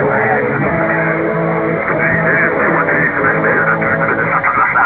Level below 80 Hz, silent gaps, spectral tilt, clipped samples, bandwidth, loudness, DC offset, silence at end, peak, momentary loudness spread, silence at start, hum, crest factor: -42 dBFS; none; -10.5 dB/octave; under 0.1%; 4 kHz; -13 LUFS; under 0.1%; 0 s; -2 dBFS; 4 LU; 0 s; none; 12 dB